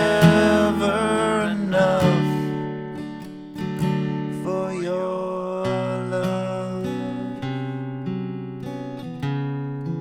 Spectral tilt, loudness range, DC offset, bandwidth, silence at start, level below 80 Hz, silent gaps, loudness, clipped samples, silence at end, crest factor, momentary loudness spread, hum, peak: -6.5 dB/octave; 8 LU; under 0.1%; 16.5 kHz; 0 s; -50 dBFS; none; -23 LUFS; under 0.1%; 0 s; 20 dB; 14 LU; none; -2 dBFS